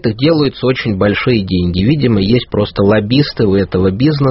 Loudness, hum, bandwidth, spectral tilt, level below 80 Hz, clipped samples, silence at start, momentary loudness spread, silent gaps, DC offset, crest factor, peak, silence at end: -13 LUFS; none; 6 kHz; -6 dB/octave; -36 dBFS; under 0.1%; 0.05 s; 3 LU; none; under 0.1%; 12 dB; 0 dBFS; 0 s